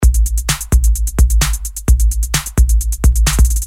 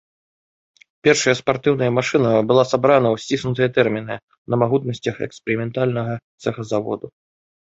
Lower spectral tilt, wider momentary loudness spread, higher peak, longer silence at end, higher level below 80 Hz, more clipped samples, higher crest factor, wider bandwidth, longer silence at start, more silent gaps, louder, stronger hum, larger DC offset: second, -4 dB/octave vs -5.5 dB/octave; second, 4 LU vs 12 LU; about the same, 0 dBFS vs 0 dBFS; second, 0 s vs 0.65 s; first, -12 dBFS vs -56 dBFS; neither; second, 12 dB vs 18 dB; first, 16.5 kHz vs 8 kHz; second, 0 s vs 1.05 s; second, none vs 4.23-4.28 s, 4.38-4.45 s, 6.24-6.38 s; first, -15 LUFS vs -19 LUFS; neither; neither